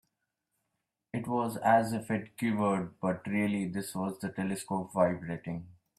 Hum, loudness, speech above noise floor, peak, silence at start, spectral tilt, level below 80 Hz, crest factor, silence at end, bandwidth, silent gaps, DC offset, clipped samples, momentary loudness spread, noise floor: none; -32 LUFS; 53 dB; -12 dBFS; 1.15 s; -6.5 dB/octave; -68 dBFS; 20 dB; 0.25 s; 14.5 kHz; none; under 0.1%; under 0.1%; 12 LU; -84 dBFS